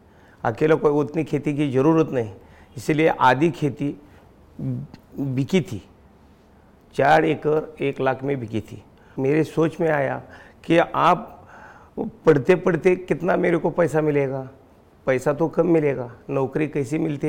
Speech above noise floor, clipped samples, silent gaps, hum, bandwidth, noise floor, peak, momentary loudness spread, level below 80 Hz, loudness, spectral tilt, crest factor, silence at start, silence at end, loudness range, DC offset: 31 dB; under 0.1%; none; none; 16.5 kHz; -52 dBFS; -6 dBFS; 15 LU; -54 dBFS; -21 LUFS; -7.5 dB/octave; 16 dB; 0.45 s; 0 s; 3 LU; under 0.1%